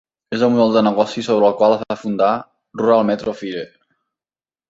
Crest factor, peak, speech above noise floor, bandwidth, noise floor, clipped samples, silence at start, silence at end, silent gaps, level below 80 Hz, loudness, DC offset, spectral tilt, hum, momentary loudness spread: 16 dB; -2 dBFS; over 74 dB; 7.8 kHz; under -90 dBFS; under 0.1%; 0.3 s; 1.05 s; none; -60 dBFS; -17 LUFS; under 0.1%; -6.5 dB/octave; none; 13 LU